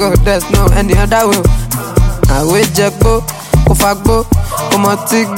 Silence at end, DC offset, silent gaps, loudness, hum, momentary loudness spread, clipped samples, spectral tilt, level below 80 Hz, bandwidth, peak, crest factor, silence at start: 0 s; under 0.1%; none; -11 LUFS; none; 4 LU; under 0.1%; -5 dB/octave; -16 dBFS; 16.5 kHz; 0 dBFS; 10 dB; 0 s